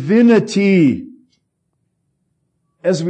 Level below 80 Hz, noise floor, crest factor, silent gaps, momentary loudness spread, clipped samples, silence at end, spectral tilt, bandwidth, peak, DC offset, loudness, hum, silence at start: -62 dBFS; -69 dBFS; 14 dB; none; 11 LU; under 0.1%; 0 s; -7 dB/octave; 9 kHz; -4 dBFS; under 0.1%; -14 LUFS; none; 0 s